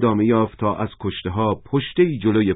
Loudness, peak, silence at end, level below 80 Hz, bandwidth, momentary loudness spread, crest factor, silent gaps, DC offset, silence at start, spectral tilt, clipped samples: -21 LUFS; -4 dBFS; 0 s; -44 dBFS; 4 kHz; 8 LU; 16 dB; none; under 0.1%; 0 s; -12 dB/octave; under 0.1%